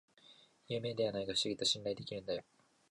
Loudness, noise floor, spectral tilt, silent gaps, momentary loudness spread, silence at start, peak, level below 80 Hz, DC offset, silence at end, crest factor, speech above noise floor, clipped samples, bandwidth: -37 LUFS; -64 dBFS; -3.5 dB/octave; none; 9 LU; 0.3 s; -20 dBFS; -72 dBFS; under 0.1%; 0.5 s; 20 dB; 26 dB; under 0.1%; 11.5 kHz